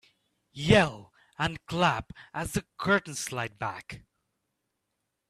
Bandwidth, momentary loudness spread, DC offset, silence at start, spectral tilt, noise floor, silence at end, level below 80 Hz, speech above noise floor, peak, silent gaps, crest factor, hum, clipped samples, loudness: 15 kHz; 21 LU; under 0.1%; 0.55 s; -4.5 dB/octave; -82 dBFS; 1.3 s; -54 dBFS; 53 dB; -6 dBFS; none; 24 dB; none; under 0.1%; -28 LUFS